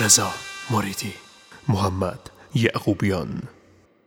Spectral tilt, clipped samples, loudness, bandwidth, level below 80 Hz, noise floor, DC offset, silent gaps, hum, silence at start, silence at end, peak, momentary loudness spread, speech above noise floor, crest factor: -3.5 dB/octave; under 0.1%; -23 LUFS; 18.5 kHz; -54 dBFS; -55 dBFS; under 0.1%; none; none; 0 s; 0.55 s; -2 dBFS; 15 LU; 33 dB; 22 dB